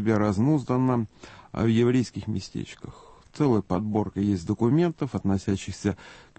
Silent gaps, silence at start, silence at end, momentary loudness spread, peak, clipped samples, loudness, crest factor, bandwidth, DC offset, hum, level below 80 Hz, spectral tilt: none; 0 s; 0.2 s; 14 LU; -10 dBFS; under 0.1%; -25 LUFS; 16 dB; 8.8 kHz; under 0.1%; none; -52 dBFS; -7.5 dB/octave